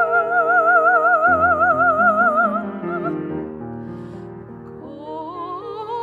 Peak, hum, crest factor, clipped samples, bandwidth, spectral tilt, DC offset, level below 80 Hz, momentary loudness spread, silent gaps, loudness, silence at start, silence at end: -4 dBFS; none; 14 dB; under 0.1%; 7.2 kHz; -8 dB/octave; under 0.1%; -54 dBFS; 21 LU; none; -16 LUFS; 0 s; 0 s